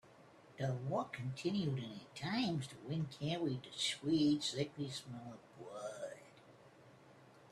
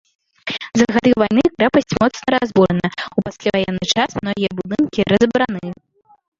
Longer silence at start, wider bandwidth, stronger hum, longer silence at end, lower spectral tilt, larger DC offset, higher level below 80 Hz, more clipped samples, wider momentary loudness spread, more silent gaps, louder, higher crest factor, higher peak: second, 0.05 s vs 0.45 s; first, 13 kHz vs 7.6 kHz; neither; second, 0 s vs 0.65 s; about the same, -5.5 dB/octave vs -5.5 dB/octave; neither; second, -74 dBFS vs -48 dBFS; neither; first, 16 LU vs 10 LU; neither; second, -40 LUFS vs -17 LUFS; about the same, 18 dB vs 16 dB; second, -24 dBFS vs 0 dBFS